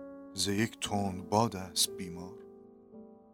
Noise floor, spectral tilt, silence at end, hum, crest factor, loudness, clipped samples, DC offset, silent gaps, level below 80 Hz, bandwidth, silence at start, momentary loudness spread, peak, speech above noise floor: -54 dBFS; -3.5 dB/octave; 0.15 s; none; 24 dB; -32 LUFS; under 0.1%; under 0.1%; none; -64 dBFS; 18 kHz; 0 s; 23 LU; -12 dBFS; 21 dB